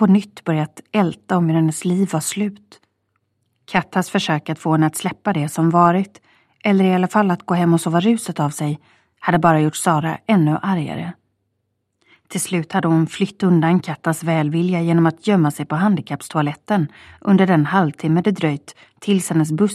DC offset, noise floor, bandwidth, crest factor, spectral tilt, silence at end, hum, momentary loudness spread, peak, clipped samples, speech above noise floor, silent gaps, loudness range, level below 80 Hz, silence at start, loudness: under 0.1%; -72 dBFS; 14 kHz; 18 dB; -6 dB/octave; 0 s; none; 9 LU; 0 dBFS; under 0.1%; 54 dB; none; 4 LU; -60 dBFS; 0 s; -18 LUFS